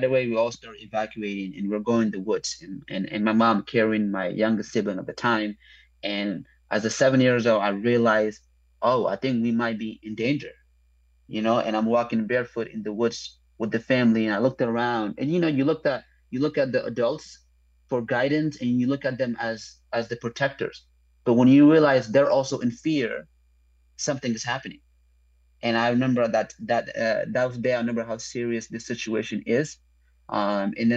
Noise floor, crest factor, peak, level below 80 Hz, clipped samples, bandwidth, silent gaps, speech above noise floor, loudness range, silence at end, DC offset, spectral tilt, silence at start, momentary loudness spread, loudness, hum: -61 dBFS; 18 dB; -6 dBFS; -60 dBFS; under 0.1%; 8.2 kHz; none; 37 dB; 6 LU; 0 s; under 0.1%; -5.5 dB/octave; 0 s; 11 LU; -24 LUFS; none